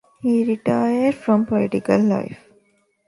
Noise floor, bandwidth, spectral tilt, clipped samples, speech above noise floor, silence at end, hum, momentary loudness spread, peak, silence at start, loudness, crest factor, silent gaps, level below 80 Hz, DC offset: -62 dBFS; 11.5 kHz; -8 dB/octave; under 0.1%; 43 dB; 0.75 s; none; 3 LU; -4 dBFS; 0.25 s; -19 LUFS; 16 dB; none; -58 dBFS; under 0.1%